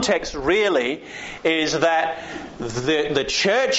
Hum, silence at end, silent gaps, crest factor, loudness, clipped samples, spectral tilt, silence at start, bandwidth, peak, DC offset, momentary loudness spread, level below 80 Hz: none; 0 s; none; 16 dB; -21 LUFS; under 0.1%; -2 dB/octave; 0 s; 8 kHz; -6 dBFS; under 0.1%; 13 LU; -48 dBFS